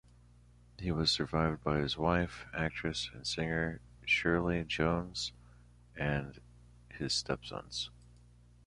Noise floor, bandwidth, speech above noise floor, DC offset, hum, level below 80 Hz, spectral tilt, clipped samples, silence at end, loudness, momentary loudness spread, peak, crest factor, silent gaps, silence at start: -60 dBFS; 11.5 kHz; 26 dB; under 0.1%; 60 Hz at -55 dBFS; -50 dBFS; -4.5 dB/octave; under 0.1%; 0.75 s; -34 LUFS; 11 LU; -14 dBFS; 22 dB; none; 0.8 s